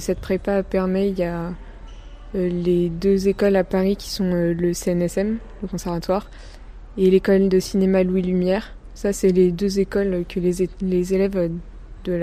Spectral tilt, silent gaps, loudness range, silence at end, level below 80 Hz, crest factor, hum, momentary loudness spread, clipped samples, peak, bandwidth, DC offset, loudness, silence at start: -7 dB/octave; none; 3 LU; 0 s; -38 dBFS; 16 dB; none; 10 LU; under 0.1%; -6 dBFS; 15.5 kHz; under 0.1%; -21 LUFS; 0 s